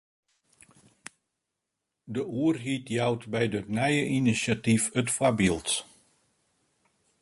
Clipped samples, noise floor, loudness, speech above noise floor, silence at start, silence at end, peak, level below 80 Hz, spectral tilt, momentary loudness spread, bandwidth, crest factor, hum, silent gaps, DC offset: under 0.1%; -84 dBFS; -27 LUFS; 58 dB; 2.05 s; 1.4 s; -10 dBFS; -58 dBFS; -4.5 dB/octave; 11 LU; 12 kHz; 20 dB; none; none; under 0.1%